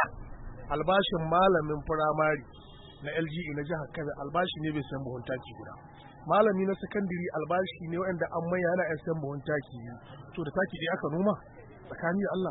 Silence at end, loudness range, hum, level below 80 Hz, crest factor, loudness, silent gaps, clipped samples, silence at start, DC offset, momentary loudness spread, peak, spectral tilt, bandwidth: 0 s; 6 LU; none; -52 dBFS; 20 dB; -30 LUFS; none; under 0.1%; 0 s; under 0.1%; 20 LU; -12 dBFS; -10 dB/octave; 4.1 kHz